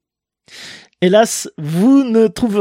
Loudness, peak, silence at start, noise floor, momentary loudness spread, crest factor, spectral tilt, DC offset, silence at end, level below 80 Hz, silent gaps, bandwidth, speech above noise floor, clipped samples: -14 LUFS; 0 dBFS; 0.55 s; -57 dBFS; 22 LU; 14 dB; -5.5 dB/octave; under 0.1%; 0 s; -52 dBFS; none; 16 kHz; 44 dB; under 0.1%